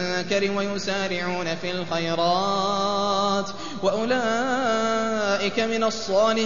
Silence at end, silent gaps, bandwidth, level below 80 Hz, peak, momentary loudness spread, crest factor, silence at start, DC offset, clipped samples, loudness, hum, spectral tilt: 0 s; none; 7.4 kHz; -60 dBFS; -8 dBFS; 5 LU; 14 dB; 0 s; 1%; under 0.1%; -24 LUFS; none; -4 dB/octave